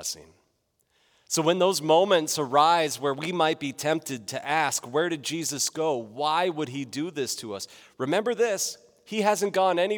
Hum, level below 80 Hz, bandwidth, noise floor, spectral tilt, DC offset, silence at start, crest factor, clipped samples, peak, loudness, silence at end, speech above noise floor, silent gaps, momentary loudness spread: none; -78 dBFS; over 20 kHz; -72 dBFS; -3 dB/octave; under 0.1%; 0 s; 20 dB; under 0.1%; -6 dBFS; -25 LUFS; 0 s; 46 dB; none; 12 LU